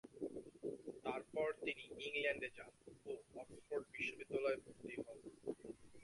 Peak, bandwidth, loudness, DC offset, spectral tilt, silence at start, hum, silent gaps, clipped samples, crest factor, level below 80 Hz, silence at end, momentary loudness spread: -28 dBFS; 11.5 kHz; -46 LUFS; under 0.1%; -4.5 dB/octave; 0.05 s; none; none; under 0.1%; 20 dB; -76 dBFS; 0 s; 14 LU